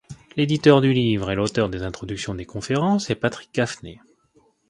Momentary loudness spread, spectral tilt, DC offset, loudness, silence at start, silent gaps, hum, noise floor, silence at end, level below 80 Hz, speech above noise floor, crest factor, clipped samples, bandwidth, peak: 15 LU; -6 dB/octave; under 0.1%; -22 LUFS; 0.1 s; none; none; -61 dBFS; 0.75 s; -48 dBFS; 40 dB; 22 dB; under 0.1%; 11.5 kHz; 0 dBFS